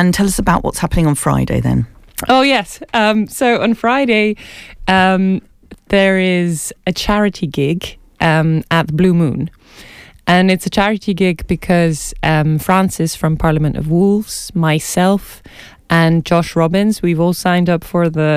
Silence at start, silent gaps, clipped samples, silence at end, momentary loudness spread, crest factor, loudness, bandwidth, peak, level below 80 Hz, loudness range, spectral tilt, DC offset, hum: 0 s; none; under 0.1%; 0 s; 7 LU; 14 dB; -14 LUFS; 16 kHz; -2 dBFS; -34 dBFS; 2 LU; -5.5 dB/octave; under 0.1%; none